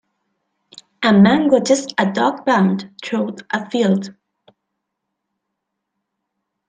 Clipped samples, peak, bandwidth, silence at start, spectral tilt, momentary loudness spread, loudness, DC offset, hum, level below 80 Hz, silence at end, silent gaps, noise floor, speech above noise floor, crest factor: under 0.1%; -2 dBFS; 9.4 kHz; 1 s; -5.5 dB/octave; 12 LU; -17 LUFS; under 0.1%; none; -62 dBFS; 2.55 s; none; -78 dBFS; 62 dB; 18 dB